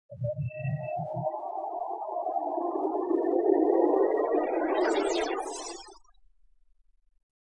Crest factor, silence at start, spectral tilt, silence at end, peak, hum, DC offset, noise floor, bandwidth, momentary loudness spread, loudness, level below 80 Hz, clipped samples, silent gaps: 18 dB; 0.1 s; -6 dB/octave; 1.5 s; -12 dBFS; none; under 0.1%; -65 dBFS; 11 kHz; 11 LU; -29 LUFS; -66 dBFS; under 0.1%; none